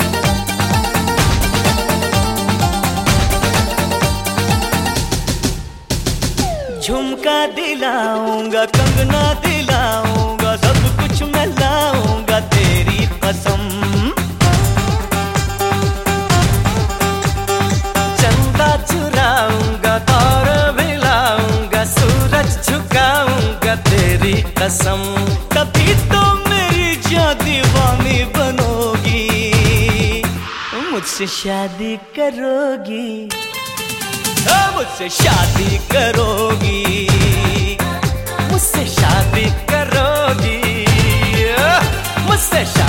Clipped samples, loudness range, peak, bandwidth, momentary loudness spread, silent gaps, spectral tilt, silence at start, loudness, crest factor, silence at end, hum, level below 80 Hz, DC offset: under 0.1%; 4 LU; 0 dBFS; 17 kHz; 6 LU; none; -4.5 dB/octave; 0 s; -15 LUFS; 14 dB; 0 s; none; -24 dBFS; under 0.1%